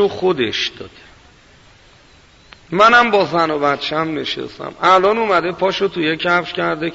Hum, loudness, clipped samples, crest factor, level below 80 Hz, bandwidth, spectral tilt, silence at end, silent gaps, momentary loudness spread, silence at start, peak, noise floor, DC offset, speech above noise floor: none; -16 LUFS; under 0.1%; 16 dB; -52 dBFS; 8 kHz; -4.5 dB/octave; 0 s; none; 12 LU; 0 s; -2 dBFS; -47 dBFS; under 0.1%; 31 dB